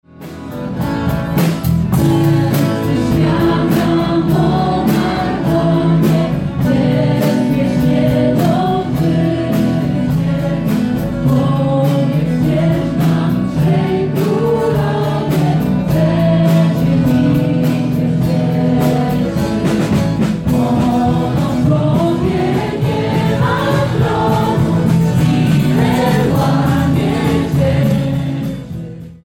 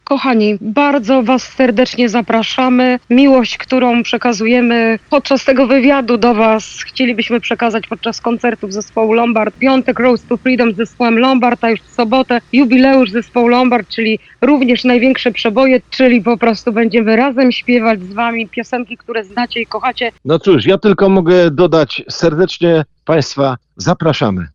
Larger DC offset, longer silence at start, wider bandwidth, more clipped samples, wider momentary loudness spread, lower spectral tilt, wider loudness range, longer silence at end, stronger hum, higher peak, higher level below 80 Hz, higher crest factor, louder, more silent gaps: neither; about the same, 0.2 s vs 0.1 s; first, 17 kHz vs 7.4 kHz; neither; second, 4 LU vs 7 LU; first, -7.5 dB/octave vs -5.5 dB/octave; about the same, 2 LU vs 3 LU; about the same, 0.1 s vs 0.05 s; neither; second, -4 dBFS vs 0 dBFS; first, -34 dBFS vs -48 dBFS; about the same, 10 dB vs 12 dB; about the same, -14 LUFS vs -12 LUFS; neither